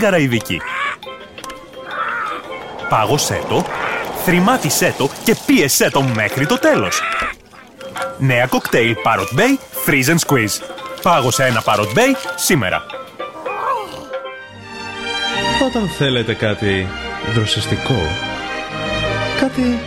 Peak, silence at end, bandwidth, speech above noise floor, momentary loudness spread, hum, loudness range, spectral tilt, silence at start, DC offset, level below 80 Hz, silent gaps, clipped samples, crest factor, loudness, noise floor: -2 dBFS; 0 s; 17 kHz; 24 dB; 14 LU; none; 5 LU; -4 dB/octave; 0 s; under 0.1%; -42 dBFS; none; under 0.1%; 16 dB; -16 LUFS; -39 dBFS